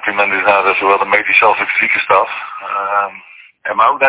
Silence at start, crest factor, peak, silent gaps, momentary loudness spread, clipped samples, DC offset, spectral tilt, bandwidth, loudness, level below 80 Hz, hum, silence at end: 0 s; 14 dB; 0 dBFS; none; 11 LU; 0.1%; under 0.1%; -6 dB/octave; 4 kHz; -12 LUFS; -56 dBFS; none; 0 s